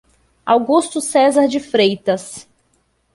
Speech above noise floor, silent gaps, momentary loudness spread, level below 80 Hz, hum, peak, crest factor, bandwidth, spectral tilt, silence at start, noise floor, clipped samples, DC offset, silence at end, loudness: 47 dB; none; 15 LU; -60 dBFS; none; -2 dBFS; 16 dB; 12 kHz; -4 dB/octave; 0.45 s; -62 dBFS; under 0.1%; under 0.1%; 0.75 s; -16 LUFS